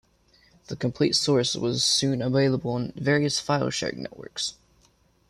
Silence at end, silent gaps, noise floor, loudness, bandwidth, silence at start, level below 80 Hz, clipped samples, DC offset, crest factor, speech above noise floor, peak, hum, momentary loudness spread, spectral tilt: 0.8 s; none; -63 dBFS; -24 LUFS; 14 kHz; 0.7 s; -58 dBFS; under 0.1%; under 0.1%; 16 dB; 38 dB; -10 dBFS; none; 10 LU; -4 dB/octave